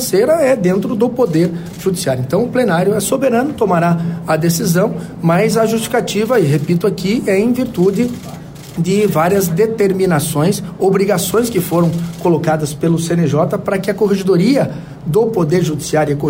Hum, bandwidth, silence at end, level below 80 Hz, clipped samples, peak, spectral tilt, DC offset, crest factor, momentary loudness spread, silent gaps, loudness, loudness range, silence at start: none; 16.5 kHz; 0 s; -46 dBFS; under 0.1%; -2 dBFS; -6 dB/octave; under 0.1%; 12 dB; 5 LU; none; -15 LUFS; 1 LU; 0 s